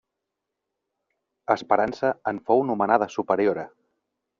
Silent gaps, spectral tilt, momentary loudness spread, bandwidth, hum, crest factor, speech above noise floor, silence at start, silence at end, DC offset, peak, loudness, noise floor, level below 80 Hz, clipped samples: none; -4.5 dB/octave; 10 LU; 7.4 kHz; none; 22 dB; 60 dB; 1.5 s; 0.75 s; under 0.1%; -4 dBFS; -24 LUFS; -83 dBFS; -66 dBFS; under 0.1%